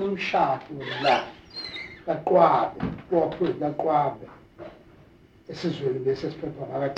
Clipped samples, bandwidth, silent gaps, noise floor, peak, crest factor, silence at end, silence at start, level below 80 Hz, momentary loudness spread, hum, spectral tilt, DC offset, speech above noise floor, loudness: under 0.1%; 8.6 kHz; none; -54 dBFS; -4 dBFS; 22 dB; 0 s; 0 s; -56 dBFS; 17 LU; none; -6.5 dB/octave; under 0.1%; 29 dB; -25 LUFS